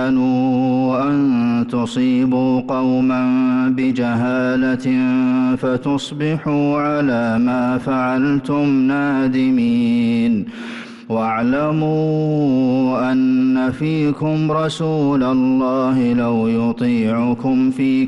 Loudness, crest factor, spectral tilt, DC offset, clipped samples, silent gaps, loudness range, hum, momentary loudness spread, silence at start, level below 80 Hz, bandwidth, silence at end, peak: -17 LUFS; 8 dB; -7.5 dB/octave; under 0.1%; under 0.1%; none; 1 LU; none; 3 LU; 0 s; -52 dBFS; 9 kHz; 0 s; -10 dBFS